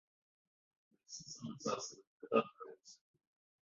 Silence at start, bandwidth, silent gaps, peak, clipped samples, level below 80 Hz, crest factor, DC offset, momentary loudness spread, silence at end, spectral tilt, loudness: 1.1 s; 7.6 kHz; 2.07-2.20 s; -18 dBFS; under 0.1%; -86 dBFS; 26 dB; under 0.1%; 21 LU; 0.75 s; -3.5 dB/octave; -41 LUFS